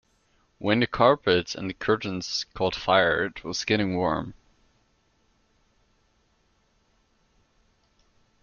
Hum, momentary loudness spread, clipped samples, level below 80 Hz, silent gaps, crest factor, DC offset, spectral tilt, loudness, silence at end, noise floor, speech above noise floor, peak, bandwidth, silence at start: none; 10 LU; under 0.1%; -56 dBFS; none; 22 dB; under 0.1%; -4.5 dB/octave; -25 LUFS; 4.1 s; -67 dBFS; 43 dB; -6 dBFS; 7.2 kHz; 0.6 s